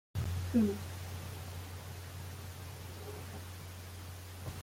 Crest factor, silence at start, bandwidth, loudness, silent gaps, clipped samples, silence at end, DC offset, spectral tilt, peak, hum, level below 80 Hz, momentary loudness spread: 20 dB; 0.15 s; 16.5 kHz; -40 LUFS; none; under 0.1%; 0 s; under 0.1%; -6 dB/octave; -18 dBFS; none; -60 dBFS; 15 LU